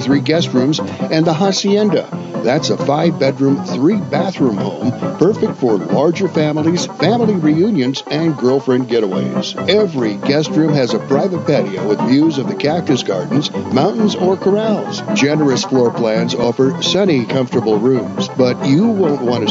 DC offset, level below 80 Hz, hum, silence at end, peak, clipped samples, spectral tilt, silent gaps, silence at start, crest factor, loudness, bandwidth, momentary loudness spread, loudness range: under 0.1%; -58 dBFS; none; 0 s; 0 dBFS; under 0.1%; -6 dB/octave; none; 0 s; 14 dB; -15 LUFS; 8 kHz; 4 LU; 1 LU